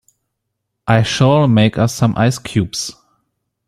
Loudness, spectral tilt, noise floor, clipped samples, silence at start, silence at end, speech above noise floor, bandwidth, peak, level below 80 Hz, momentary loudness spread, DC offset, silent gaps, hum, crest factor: -15 LUFS; -6 dB/octave; -75 dBFS; under 0.1%; 0.85 s; 0.75 s; 61 dB; 14.5 kHz; -2 dBFS; -46 dBFS; 11 LU; under 0.1%; none; none; 14 dB